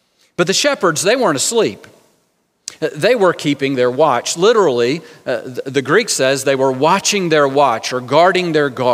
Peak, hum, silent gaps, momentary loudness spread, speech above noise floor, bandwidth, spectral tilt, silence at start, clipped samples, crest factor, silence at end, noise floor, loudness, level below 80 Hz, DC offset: 0 dBFS; none; none; 10 LU; 48 dB; 16 kHz; -3.5 dB/octave; 0.4 s; under 0.1%; 16 dB; 0 s; -63 dBFS; -15 LUFS; -68 dBFS; under 0.1%